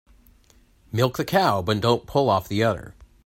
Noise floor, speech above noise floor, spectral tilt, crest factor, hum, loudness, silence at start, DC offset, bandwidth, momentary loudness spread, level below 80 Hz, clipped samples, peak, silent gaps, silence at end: -57 dBFS; 35 dB; -6 dB/octave; 18 dB; none; -22 LUFS; 0.95 s; under 0.1%; 16 kHz; 4 LU; -52 dBFS; under 0.1%; -6 dBFS; none; 0.35 s